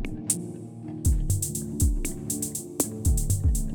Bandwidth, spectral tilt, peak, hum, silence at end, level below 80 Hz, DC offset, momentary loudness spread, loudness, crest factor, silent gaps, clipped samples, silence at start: over 20 kHz; -5 dB/octave; -10 dBFS; none; 0 s; -30 dBFS; under 0.1%; 6 LU; -27 LUFS; 16 dB; none; under 0.1%; 0 s